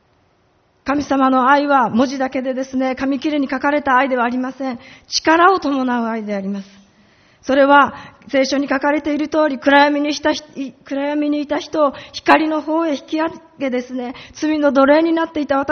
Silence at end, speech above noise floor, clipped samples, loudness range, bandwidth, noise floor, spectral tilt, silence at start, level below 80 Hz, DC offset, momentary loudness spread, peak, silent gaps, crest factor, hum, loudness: 0 s; 42 dB; under 0.1%; 3 LU; 6.6 kHz; -58 dBFS; -2 dB/octave; 0.85 s; -54 dBFS; under 0.1%; 13 LU; 0 dBFS; none; 18 dB; none; -17 LUFS